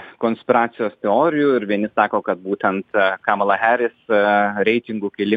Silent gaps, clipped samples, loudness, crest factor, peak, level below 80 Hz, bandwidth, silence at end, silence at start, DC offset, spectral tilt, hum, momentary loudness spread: none; under 0.1%; -19 LUFS; 18 dB; -2 dBFS; -66 dBFS; 4.9 kHz; 0 s; 0 s; under 0.1%; -8 dB/octave; none; 7 LU